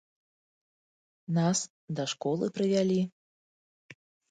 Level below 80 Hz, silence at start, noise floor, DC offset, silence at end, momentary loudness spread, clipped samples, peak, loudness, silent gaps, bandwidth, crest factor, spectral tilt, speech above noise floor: -76 dBFS; 1.3 s; under -90 dBFS; under 0.1%; 0.4 s; 10 LU; under 0.1%; -14 dBFS; -30 LUFS; 1.70-1.88 s, 3.12-3.89 s; 9.4 kHz; 18 dB; -5.5 dB/octave; over 61 dB